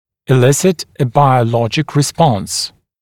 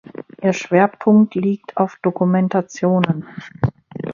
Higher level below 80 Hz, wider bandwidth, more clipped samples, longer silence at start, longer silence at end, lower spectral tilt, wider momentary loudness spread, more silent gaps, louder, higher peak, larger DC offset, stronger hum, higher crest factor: about the same, -48 dBFS vs -50 dBFS; first, 16.5 kHz vs 7.2 kHz; neither; about the same, 0.3 s vs 0.4 s; first, 0.35 s vs 0 s; second, -5.5 dB/octave vs -7.5 dB/octave; about the same, 8 LU vs 10 LU; neither; first, -14 LUFS vs -18 LUFS; about the same, 0 dBFS vs 0 dBFS; neither; neither; about the same, 14 dB vs 18 dB